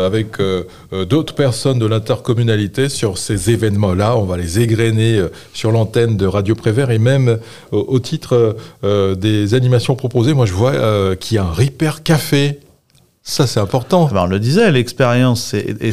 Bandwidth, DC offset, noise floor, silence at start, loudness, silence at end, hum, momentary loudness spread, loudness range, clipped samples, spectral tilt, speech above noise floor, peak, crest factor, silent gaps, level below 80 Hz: 15 kHz; 1%; -54 dBFS; 0 s; -15 LUFS; 0 s; none; 6 LU; 2 LU; under 0.1%; -6 dB/octave; 39 dB; 0 dBFS; 14 dB; none; -44 dBFS